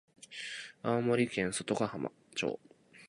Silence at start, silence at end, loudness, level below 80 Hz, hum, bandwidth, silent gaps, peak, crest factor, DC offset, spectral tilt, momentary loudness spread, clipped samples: 0.2 s; 0 s; -35 LUFS; -70 dBFS; none; 11.5 kHz; none; -16 dBFS; 20 dB; under 0.1%; -4.5 dB/octave; 12 LU; under 0.1%